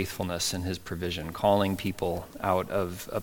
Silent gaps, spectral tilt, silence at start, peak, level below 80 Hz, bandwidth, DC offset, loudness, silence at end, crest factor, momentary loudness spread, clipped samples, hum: none; -4.5 dB/octave; 0 s; -10 dBFS; -52 dBFS; 17.5 kHz; under 0.1%; -29 LUFS; 0 s; 20 dB; 8 LU; under 0.1%; none